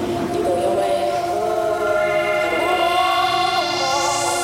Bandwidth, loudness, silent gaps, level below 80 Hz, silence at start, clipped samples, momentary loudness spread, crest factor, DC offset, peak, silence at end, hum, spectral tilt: 16.5 kHz; -19 LUFS; none; -50 dBFS; 0 s; under 0.1%; 4 LU; 12 dB; under 0.1%; -6 dBFS; 0 s; none; -3 dB/octave